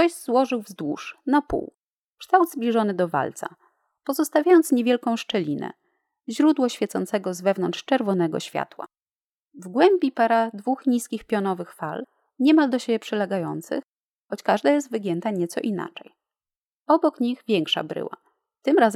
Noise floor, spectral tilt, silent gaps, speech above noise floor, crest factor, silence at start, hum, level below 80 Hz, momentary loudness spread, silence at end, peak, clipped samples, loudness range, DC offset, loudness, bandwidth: under -90 dBFS; -5 dB/octave; 1.74-2.17 s, 9.02-9.06 s, 9.12-9.51 s, 13.87-13.93 s, 14.00-14.25 s, 16.67-16.86 s; over 67 dB; 20 dB; 0 s; none; -60 dBFS; 15 LU; 0 s; -4 dBFS; under 0.1%; 4 LU; under 0.1%; -23 LUFS; 16 kHz